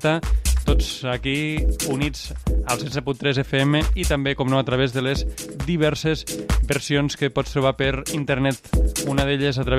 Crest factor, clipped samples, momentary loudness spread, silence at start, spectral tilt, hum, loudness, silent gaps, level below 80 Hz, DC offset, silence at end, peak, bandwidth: 16 dB; under 0.1%; 5 LU; 0 s; -5 dB/octave; none; -22 LUFS; none; -26 dBFS; under 0.1%; 0 s; -6 dBFS; 15 kHz